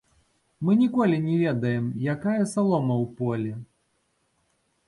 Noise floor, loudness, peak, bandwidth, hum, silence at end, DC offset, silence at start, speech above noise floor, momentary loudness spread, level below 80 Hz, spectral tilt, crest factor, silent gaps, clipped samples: -71 dBFS; -25 LUFS; -10 dBFS; 11.5 kHz; none; 1.25 s; under 0.1%; 0.6 s; 47 dB; 8 LU; -64 dBFS; -8 dB/octave; 14 dB; none; under 0.1%